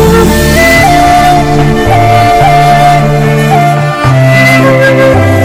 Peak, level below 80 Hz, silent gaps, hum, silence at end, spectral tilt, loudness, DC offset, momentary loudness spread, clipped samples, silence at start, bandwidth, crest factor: 0 dBFS; -20 dBFS; none; none; 0 s; -5.5 dB/octave; -5 LUFS; under 0.1%; 4 LU; 1%; 0 s; 16.5 kHz; 4 dB